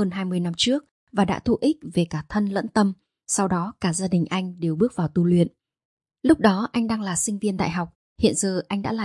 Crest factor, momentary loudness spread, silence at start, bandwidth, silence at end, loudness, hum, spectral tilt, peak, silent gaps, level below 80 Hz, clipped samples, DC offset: 20 dB; 6 LU; 0 s; 11.5 kHz; 0 s; -23 LUFS; none; -5 dB/octave; -4 dBFS; 0.91-1.07 s, 5.85-5.97 s, 7.95-8.16 s; -52 dBFS; under 0.1%; under 0.1%